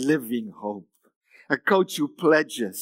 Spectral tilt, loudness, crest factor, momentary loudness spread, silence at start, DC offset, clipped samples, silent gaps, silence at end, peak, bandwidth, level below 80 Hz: -4.5 dB/octave; -24 LUFS; 20 dB; 14 LU; 0 s; under 0.1%; under 0.1%; 1.16-1.21 s; 0 s; -6 dBFS; 16 kHz; -86 dBFS